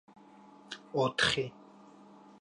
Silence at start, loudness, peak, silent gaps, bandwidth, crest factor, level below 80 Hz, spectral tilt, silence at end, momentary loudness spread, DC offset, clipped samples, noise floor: 0.7 s; -31 LUFS; -12 dBFS; none; 11 kHz; 24 dB; -64 dBFS; -3.5 dB/octave; 0.9 s; 19 LU; under 0.1%; under 0.1%; -56 dBFS